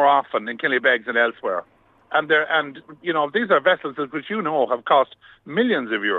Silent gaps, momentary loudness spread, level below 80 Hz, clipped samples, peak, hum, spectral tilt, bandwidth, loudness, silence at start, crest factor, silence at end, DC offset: none; 9 LU; -72 dBFS; under 0.1%; -4 dBFS; none; -6.5 dB/octave; 6.6 kHz; -21 LUFS; 0 s; 18 dB; 0 s; under 0.1%